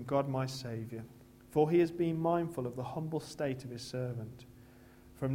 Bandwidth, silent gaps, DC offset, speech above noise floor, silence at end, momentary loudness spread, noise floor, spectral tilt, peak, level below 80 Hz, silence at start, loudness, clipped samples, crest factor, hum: 16 kHz; none; under 0.1%; 23 dB; 0 s; 15 LU; -57 dBFS; -7 dB/octave; -16 dBFS; -64 dBFS; 0 s; -35 LUFS; under 0.1%; 20 dB; none